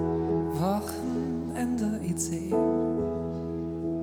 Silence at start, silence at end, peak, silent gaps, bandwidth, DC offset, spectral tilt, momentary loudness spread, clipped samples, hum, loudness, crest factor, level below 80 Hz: 0 s; 0 s; -14 dBFS; none; 19 kHz; under 0.1%; -6.5 dB/octave; 6 LU; under 0.1%; none; -29 LUFS; 14 dB; -52 dBFS